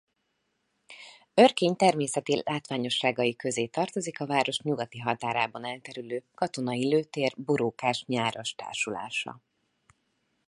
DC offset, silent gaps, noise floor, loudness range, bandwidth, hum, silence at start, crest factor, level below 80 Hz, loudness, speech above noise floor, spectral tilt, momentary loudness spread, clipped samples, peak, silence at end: under 0.1%; none; -77 dBFS; 4 LU; 11.5 kHz; none; 0.9 s; 24 dB; -74 dBFS; -28 LUFS; 49 dB; -4 dB/octave; 13 LU; under 0.1%; -4 dBFS; 1.1 s